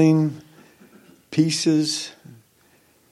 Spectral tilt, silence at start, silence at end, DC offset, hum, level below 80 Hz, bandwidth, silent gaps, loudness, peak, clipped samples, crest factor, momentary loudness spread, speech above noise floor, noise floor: -5.5 dB/octave; 0 s; 1 s; under 0.1%; none; -70 dBFS; 12.5 kHz; none; -21 LUFS; -6 dBFS; under 0.1%; 18 dB; 14 LU; 39 dB; -58 dBFS